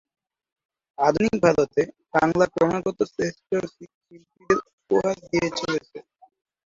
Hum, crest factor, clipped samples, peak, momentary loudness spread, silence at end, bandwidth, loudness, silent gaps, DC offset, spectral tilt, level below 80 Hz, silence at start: none; 22 dB; under 0.1%; -4 dBFS; 8 LU; 0.65 s; 7.8 kHz; -23 LUFS; 3.94-4.01 s, 4.73-4.78 s; under 0.1%; -5.5 dB/octave; -56 dBFS; 1 s